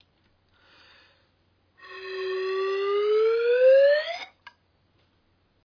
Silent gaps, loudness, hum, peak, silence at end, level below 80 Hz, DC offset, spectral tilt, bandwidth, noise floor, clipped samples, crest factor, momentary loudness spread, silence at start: none; -23 LUFS; none; -10 dBFS; 1.55 s; -76 dBFS; under 0.1%; -3.5 dB/octave; 5.4 kHz; -67 dBFS; under 0.1%; 16 dB; 21 LU; 1.85 s